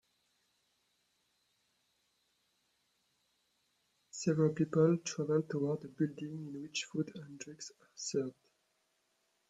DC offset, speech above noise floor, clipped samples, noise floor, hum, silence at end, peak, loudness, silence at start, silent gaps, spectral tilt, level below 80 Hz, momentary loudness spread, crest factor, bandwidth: under 0.1%; 44 dB; under 0.1%; -79 dBFS; none; 1.2 s; -16 dBFS; -36 LUFS; 4.15 s; none; -6 dB/octave; -80 dBFS; 17 LU; 22 dB; 9.2 kHz